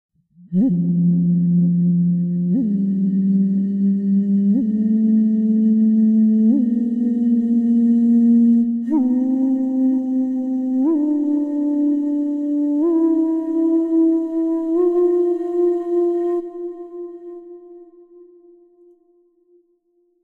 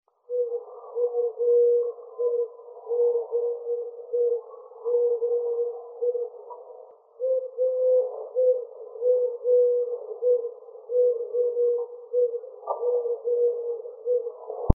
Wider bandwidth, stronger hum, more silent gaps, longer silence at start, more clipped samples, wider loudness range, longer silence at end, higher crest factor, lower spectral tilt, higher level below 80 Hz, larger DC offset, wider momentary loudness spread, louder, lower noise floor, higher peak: first, 2 kHz vs 1.3 kHz; neither; neither; first, 0.5 s vs 0.3 s; neither; first, 6 LU vs 3 LU; first, 2.4 s vs 0 s; second, 10 dB vs 26 dB; first, -12.5 dB/octave vs -1.5 dB/octave; second, -66 dBFS vs -50 dBFS; neither; second, 6 LU vs 12 LU; first, -18 LUFS vs -26 LUFS; first, -63 dBFS vs -48 dBFS; second, -8 dBFS vs 0 dBFS